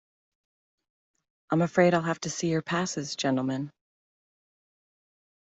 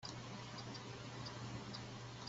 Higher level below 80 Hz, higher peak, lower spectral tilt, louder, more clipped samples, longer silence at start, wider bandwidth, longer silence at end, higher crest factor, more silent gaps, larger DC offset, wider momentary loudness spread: about the same, -70 dBFS vs -68 dBFS; first, -8 dBFS vs -32 dBFS; about the same, -5 dB/octave vs -4 dB/octave; first, -27 LUFS vs -49 LUFS; neither; first, 1.5 s vs 0 s; about the same, 8.2 kHz vs 8 kHz; first, 1.8 s vs 0 s; about the same, 22 dB vs 18 dB; neither; neither; first, 9 LU vs 2 LU